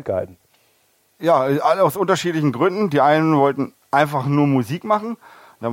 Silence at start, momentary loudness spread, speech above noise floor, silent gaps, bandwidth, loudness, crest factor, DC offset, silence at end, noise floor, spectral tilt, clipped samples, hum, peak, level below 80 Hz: 0.05 s; 11 LU; 43 dB; none; 16.5 kHz; -18 LUFS; 18 dB; under 0.1%; 0 s; -61 dBFS; -6.5 dB/octave; under 0.1%; none; 0 dBFS; -64 dBFS